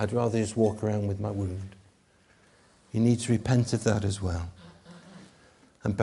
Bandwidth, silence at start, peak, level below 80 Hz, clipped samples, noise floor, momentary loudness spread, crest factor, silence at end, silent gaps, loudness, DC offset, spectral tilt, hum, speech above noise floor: 11.5 kHz; 0 s; -8 dBFS; -52 dBFS; under 0.1%; -62 dBFS; 15 LU; 20 dB; 0 s; none; -28 LUFS; under 0.1%; -6.5 dB/octave; none; 36 dB